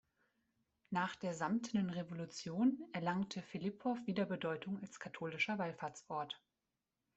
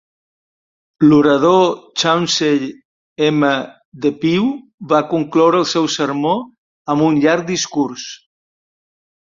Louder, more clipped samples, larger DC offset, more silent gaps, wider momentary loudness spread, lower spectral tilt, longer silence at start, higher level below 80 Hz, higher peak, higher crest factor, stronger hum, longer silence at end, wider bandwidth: second, -41 LUFS vs -15 LUFS; neither; neither; second, none vs 2.85-3.16 s, 3.85-3.92 s, 4.74-4.78 s, 6.58-6.85 s; about the same, 10 LU vs 10 LU; about the same, -5.5 dB/octave vs -5 dB/octave; about the same, 0.9 s vs 1 s; second, -80 dBFS vs -58 dBFS; second, -24 dBFS vs -2 dBFS; about the same, 18 dB vs 16 dB; neither; second, 0.8 s vs 1.25 s; about the same, 8.2 kHz vs 7.6 kHz